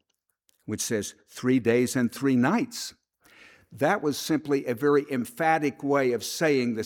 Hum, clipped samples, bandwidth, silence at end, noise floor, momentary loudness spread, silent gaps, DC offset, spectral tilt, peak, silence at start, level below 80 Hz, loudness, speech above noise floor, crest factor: none; under 0.1%; 18.5 kHz; 0 s; -72 dBFS; 9 LU; none; under 0.1%; -5 dB/octave; -8 dBFS; 0.7 s; -70 dBFS; -26 LUFS; 47 dB; 18 dB